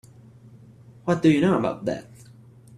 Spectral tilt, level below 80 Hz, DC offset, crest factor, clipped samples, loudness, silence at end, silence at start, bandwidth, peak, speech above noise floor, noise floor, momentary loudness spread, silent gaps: -7.5 dB/octave; -58 dBFS; under 0.1%; 20 dB; under 0.1%; -23 LUFS; 0.75 s; 1.05 s; 11 kHz; -6 dBFS; 28 dB; -49 dBFS; 15 LU; none